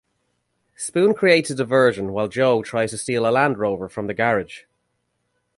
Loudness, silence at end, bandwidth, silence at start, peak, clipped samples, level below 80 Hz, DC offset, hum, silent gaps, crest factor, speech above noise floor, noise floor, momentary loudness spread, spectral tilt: -20 LUFS; 1 s; 11.5 kHz; 0.8 s; 0 dBFS; under 0.1%; -58 dBFS; under 0.1%; 60 Hz at -50 dBFS; none; 20 dB; 53 dB; -72 dBFS; 9 LU; -5 dB/octave